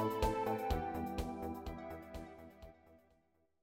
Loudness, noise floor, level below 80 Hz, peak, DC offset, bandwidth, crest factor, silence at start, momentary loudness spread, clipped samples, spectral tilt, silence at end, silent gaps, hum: -41 LUFS; -76 dBFS; -50 dBFS; -20 dBFS; under 0.1%; 16.5 kHz; 20 dB; 0 s; 20 LU; under 0.1%; -6.5 dB/octave; 0.65 s; none; none